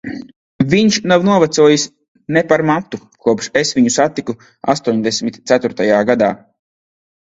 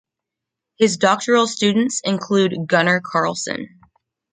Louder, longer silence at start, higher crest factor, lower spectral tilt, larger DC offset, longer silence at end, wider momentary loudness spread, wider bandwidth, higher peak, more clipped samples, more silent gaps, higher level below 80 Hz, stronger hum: first, -14 LUFS vs -18 LUFS; second, 0.05 s vs 0.8 s; about the same, 16 dB vs 18 dB; about the same, -4.5 dB/octave vs -4 dB/octave; neither; first, 0.85 s vs 0.65 s; first, 13 LU vs 9 LU; second, 8 kHz vs 9.6 kHz; about the same, 0 dBFS vs -2 dBFS; neither; first, 0.36-0.59 s, 2.08-2.15 s vs none; first, -52 dBFS vs -64 dBFS; neither